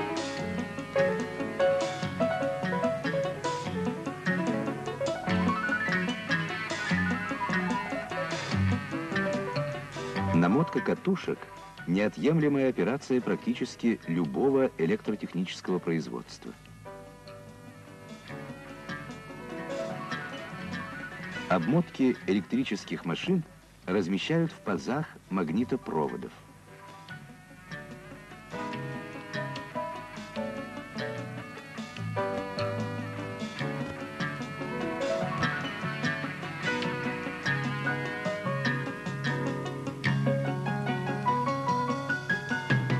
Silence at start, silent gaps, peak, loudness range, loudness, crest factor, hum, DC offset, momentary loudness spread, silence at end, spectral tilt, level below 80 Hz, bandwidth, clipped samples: 0 s; none; -12 dBFS; 9 LU; -31 LUFS; 18 dB; none; under 0.1%; 15 LU; 0 s; -6 dB/octave; -62 dBFS; 13 kHz; under 0.1%